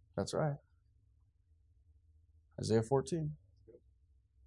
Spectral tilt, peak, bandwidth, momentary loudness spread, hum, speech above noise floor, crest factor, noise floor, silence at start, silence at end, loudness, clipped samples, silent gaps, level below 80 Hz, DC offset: -6.5 dB/octave; -18 dBFS; 11.5 kHz; 18 LU; none; 36 dB; 22 dB; -71 dBFS; 0.15 s; 0.75 s; -37 LUFS; under 0.1%; none; -68 dBFS; under 0.1%